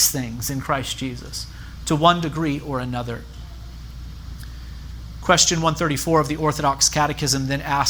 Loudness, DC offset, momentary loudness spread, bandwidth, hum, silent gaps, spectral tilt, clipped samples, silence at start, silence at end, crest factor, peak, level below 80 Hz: -21 LUFS; under 0.1%; 20 LU; over 20 kHz; none; none; -3.5 dB/octave; under 0.1%; 0 s; 0 s; 20 dB; -2 dBFS; -38 dBFS